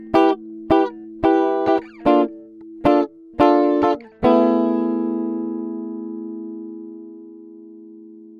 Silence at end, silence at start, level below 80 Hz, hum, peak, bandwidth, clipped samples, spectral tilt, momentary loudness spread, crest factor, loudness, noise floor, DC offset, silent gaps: 0 s; 0 s; -50 dBFS; none; -2 dBFS; 6.6 kHz; under 0.1%; -7.5 dB/octave; 19 LU; 18 dB; -19 LUFS; -41 dBFS; under 0.1%; none